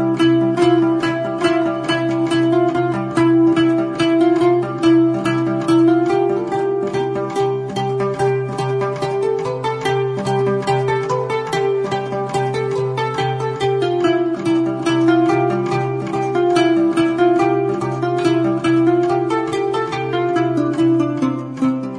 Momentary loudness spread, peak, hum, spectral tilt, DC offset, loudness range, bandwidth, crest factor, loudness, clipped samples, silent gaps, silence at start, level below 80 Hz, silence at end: 6 LU; -4 dBFS; none; -7 dB/octave; under 0.1%; 4 LU; 10.5 kHz; 14 dB; -17 LUFS; under 0.1%; none; 0 s; -54 dBFS; 0 s